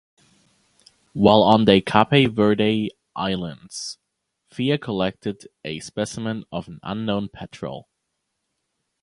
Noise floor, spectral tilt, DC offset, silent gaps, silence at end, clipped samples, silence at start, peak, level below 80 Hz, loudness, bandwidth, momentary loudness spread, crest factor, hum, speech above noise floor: -77 dBFS; -6 dB/octave; under 0.1%; none; 1.2 s; under 0.1%; 1.15 s; 0 dBFS; -52 dBFS; -21 LUFS; 11.5 kHz; 18 LU; 22 dB; none; 56 dB